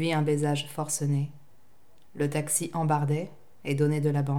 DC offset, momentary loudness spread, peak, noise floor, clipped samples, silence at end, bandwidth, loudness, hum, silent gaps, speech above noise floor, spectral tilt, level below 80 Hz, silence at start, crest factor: 0.4%; 7 LU; -12 dBFS; -64 dBFS; under 0.1%; 0 s; 17 kHz; -28 LUFS; none; none; 37 dB; -5.5 dB/octave; -72 dBFS; 0 s; 16 dB